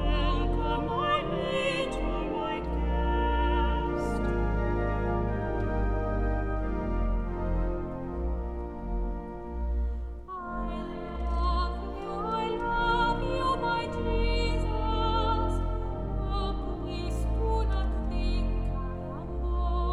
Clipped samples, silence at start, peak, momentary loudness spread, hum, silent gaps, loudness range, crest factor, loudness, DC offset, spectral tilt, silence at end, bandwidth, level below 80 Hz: under 0.1%; 0 s; -14 dBFS; 8 LU; none; none; 5 LU; 14 dB; -31 LUFS; under 0.1%; -7 dB/octave; 0 s; 10.5 kHz; -32 dBFS